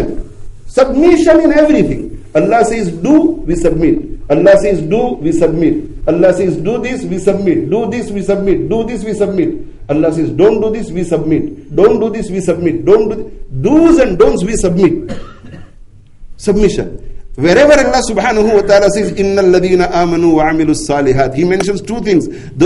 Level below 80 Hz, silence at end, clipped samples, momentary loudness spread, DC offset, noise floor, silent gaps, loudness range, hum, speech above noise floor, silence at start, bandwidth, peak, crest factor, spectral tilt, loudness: -28 dBFS; 0 s; 0.2%; 10 LU; under 0.1%; -36 dBFS; none; 4 LU; none; 25 dB; 0 s; 11.5 kHz; 0 dBFS; 12 dB; -6 dB/octave; -11 LUFS